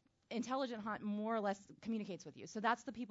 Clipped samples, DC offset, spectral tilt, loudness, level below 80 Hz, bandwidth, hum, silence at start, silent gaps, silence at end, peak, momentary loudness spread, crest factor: under 0.1%; under 0.1%; -4 dB/octave; -42 LUFS; -80 dBFS; 7.6 kHz; none; 0.3 s; none; 0 s; -22 dBFS; 9 LU; 20 dB